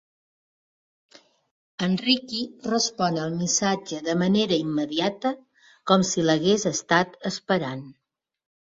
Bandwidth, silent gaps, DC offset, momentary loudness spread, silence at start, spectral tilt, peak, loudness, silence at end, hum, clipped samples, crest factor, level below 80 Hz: 7.8 kHz; none; under 0.1%; 9 LU; 1.8 s; -4 dB/octave; -4 dBFS; -24 LUFS; 0.7 s; none; under 0.1%; 22 dB; -64 dBFS